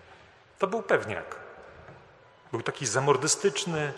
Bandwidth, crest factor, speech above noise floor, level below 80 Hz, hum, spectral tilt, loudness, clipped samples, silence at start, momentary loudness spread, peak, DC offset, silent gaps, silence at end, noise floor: 13 kHz; 24 dB; 28 dB; -66 dBFS; none; -3.5 dB/octave; -28 LUFS; under 0.1%; 0.1 s; 20 LU; -6 dBFS; under 0.1%; none; 0 s; -55 dBFS